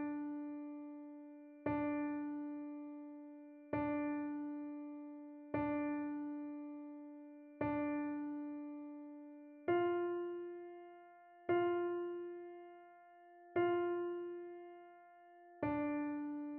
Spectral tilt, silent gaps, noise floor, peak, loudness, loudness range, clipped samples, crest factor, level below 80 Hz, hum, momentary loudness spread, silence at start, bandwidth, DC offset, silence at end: -6 dB/octave; none; -62 dBFS; -24 dBFS; -42 LUFS; 4 LU; under 0.1%; 18 dB; -74 dBFS; none; 19 LU; 0 s; 3.8 kHz; under 0.1%; 0 s